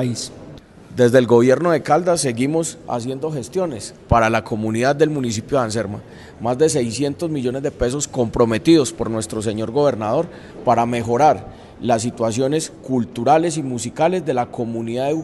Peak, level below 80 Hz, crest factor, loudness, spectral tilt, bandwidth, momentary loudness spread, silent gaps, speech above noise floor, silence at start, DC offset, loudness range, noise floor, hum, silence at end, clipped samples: 0 dBFS; -44 dBFS; 18 dB; -19 LUFS; -5.5 dB/octave; 12.5 kHz; 10 LU; none; 21 dB; 0 s; under 0.1%; 3 LU; -40 dBFS; none; 0 s; under 0.1%